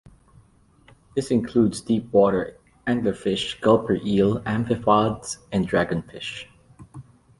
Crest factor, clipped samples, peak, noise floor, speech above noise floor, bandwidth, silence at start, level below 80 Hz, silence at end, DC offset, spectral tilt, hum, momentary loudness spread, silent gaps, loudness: 20 dB; under 0.1%; -4 dBFS; -56 dBFS; 34 dB; 11.5 kHz; 1.15 s; -50 dBFS; 0.4 s; under 0.1%; -6 dB/octave; none; 13 LU; none; -23 LUFS